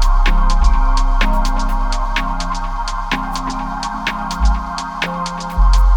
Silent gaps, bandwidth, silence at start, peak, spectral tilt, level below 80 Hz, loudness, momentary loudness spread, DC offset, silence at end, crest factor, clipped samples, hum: none; 9.6 kHz; 0 s; 0 dBFS; -4.5 dB/octave; -16 dBFS; -19 LUFS; 6 LU; under 0.1%; 0 s; 14 dB; under 0.1%; none